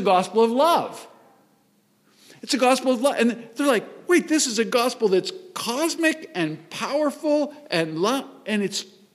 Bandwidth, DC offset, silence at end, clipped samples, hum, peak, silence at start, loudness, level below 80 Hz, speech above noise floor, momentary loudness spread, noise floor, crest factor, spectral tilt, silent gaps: 15 kHz; under 0.1%; 0.3 s; under 0.1%; none; -6 dBFS; 0 s; -22 LUFS; -80 dBFS; 41 dB; 9 LU; -63 dBFS; 18 dB; -3.5 dB/octave; none